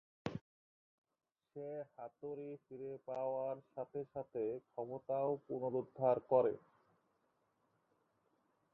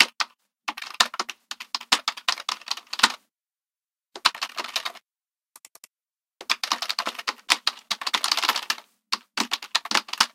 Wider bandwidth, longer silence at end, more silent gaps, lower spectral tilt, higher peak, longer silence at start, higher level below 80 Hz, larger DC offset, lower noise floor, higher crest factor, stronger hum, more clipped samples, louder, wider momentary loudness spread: second, 5.4 kHz vs 17 kHz; first, 2.15 s vs 0.05 s; first, 0.41-1.02 s vs none; first, -7.5 dB/octave vs 1.5 dB/octave; second, -20 dBFS vs 0 dBFS; first, 0.25 s vs 0 s; second, -80 dBFS vs -70 dBFS; neither; second, -81 dBFS vs under -90 dBFS; about the same, 24 dB vs 28 dB; neither; neither; second, -41 LUFS vs -25 LUFS; first, 16 LU vs 12 LU